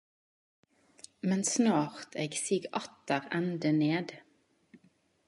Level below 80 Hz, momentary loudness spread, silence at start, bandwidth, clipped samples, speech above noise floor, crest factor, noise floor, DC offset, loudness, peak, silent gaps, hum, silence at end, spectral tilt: -80 dBFS; 10 LU; 1.25 s; 11.5 kHz; under 0.1%; 39 dB; 20 dB; -70 dBFS; under 0.1%; -31 LUFS; -14 dBFS; none; none; 1.05 s; -4.5 dB/octave